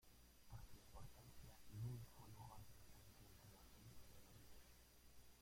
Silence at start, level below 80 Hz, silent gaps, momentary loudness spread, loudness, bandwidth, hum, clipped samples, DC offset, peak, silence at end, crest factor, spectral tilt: 0 s; -70 dBFS; none; 14 LU; -62 LUFS; 16.5 kHz; 60 Hz at -70 dBFS; under 0.1%; under 0.1%; -42 dBFS; 0 s; 18 dB; -5 dB/octave